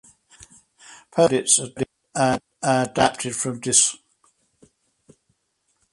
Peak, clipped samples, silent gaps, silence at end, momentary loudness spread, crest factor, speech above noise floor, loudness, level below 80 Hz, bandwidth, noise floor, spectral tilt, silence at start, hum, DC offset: -2 dBFS; under 0.1%; none; 1.95 s; 12 LU; 22 dB; 51 dB; -20 LUFS; -58 dBFS; 11.5 kHz; -71 dBFS; -3 dB/octave; 0.4 s; none; under 0.1%